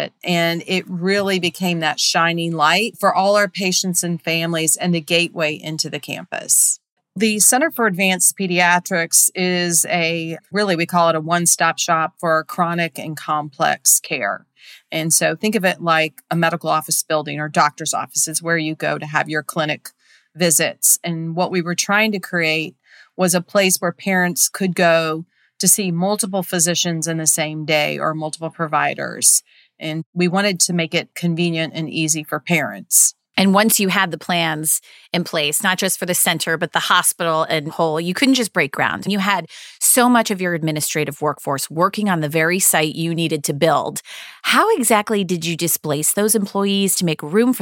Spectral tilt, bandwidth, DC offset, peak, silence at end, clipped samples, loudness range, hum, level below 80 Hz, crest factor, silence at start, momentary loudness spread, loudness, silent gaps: -3 dB/octave; 17 kHz; under 0.1%; 0 dBFS; 0 s; under 0.1%; 3 LU; none; -72 dBFS; 18 dB; 0 s; 9 LU; -17 LUFS; 6.92-6.97 s, 30.06-30.13 s